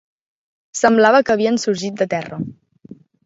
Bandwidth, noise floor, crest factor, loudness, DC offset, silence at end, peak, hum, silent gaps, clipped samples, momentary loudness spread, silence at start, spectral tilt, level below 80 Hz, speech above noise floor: 7.8 kHz; -43 dBFS; 18 dB; -16 LUFS; under 0.1%; 0.3 s; 0 dBFS; none; none; under 0.1%; 17 LU; 0.75 s; -4.5 dB/octave; -60 dBFS; 27 dB